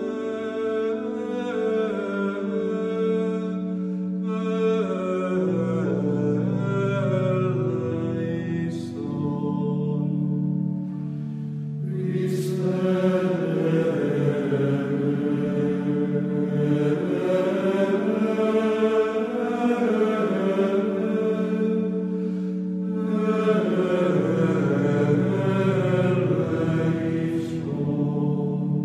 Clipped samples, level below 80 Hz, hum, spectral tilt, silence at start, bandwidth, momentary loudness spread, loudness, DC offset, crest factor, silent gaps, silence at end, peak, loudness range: under 0.1%; -66 dBFS; none; -8.5 dB/octave; 0 s; 11 kHz; 6 LU; -24 LUFS; under 0.1%; 14 dB; none; 0 s; -8 dBFS; 4 LU